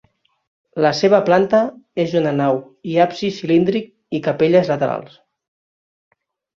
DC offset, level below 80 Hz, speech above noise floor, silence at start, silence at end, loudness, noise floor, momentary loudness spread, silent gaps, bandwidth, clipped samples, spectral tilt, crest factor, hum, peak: under 0.1%; -60 dBFS; over 73 dB; 0.75 s; 1.5 s; -17 LUFS; under -90 dBFS; 10 LU; none; 7.4 kHz; under 0.1%; -6.5 dB/octave; 18 dB; none; 0 dBFS